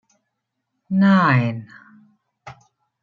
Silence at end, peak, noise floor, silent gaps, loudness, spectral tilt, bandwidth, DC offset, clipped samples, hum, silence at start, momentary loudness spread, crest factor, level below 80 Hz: 0.5 s; -4 dBFS; -78 dBFS; none; -17 LUFS; -8.5 dB/octave; 6.8 kHz; under 0.1%; under 0.1%; none; 0.9 s; 13 LU; 18 dB; -64 dBFS